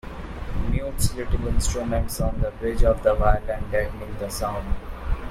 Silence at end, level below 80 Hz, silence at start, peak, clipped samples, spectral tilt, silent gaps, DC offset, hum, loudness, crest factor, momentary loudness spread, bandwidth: 0 s; -26 dBFS; 0.05 s; -4 dBFS; under 0.1%; -5.5 dB/octave; none; under 0.1%; none; -26 LUFS; 18 dB; 12 LU; 15.5 kHz